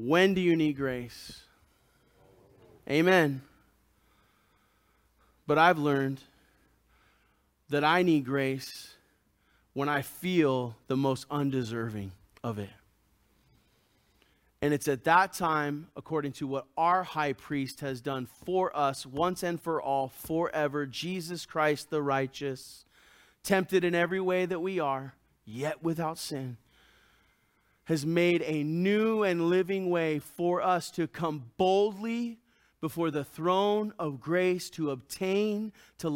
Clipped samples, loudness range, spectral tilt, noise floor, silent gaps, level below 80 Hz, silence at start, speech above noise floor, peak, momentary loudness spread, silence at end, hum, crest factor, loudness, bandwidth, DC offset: under 0.1%; 4 LU; -5.5 dB/octave; -70 dBFS; none; -66 dBFS; 0 s; 41 dB; -8 dBFS; 14 LU; 0 s; none; 22 dB; -29 LUFS; 17 kHz; under 0.1%